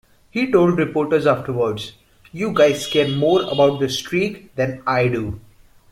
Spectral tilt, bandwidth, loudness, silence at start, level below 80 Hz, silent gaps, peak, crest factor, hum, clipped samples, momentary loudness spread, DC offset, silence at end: -5.5 dB/octave; 15.5 kHz; -19 LUFS; 0.35 s; -50 dBFS; none; -2 dBFS; 16 dB; none; under 0.1%; 12 LU; under 0.1%; 0.5 s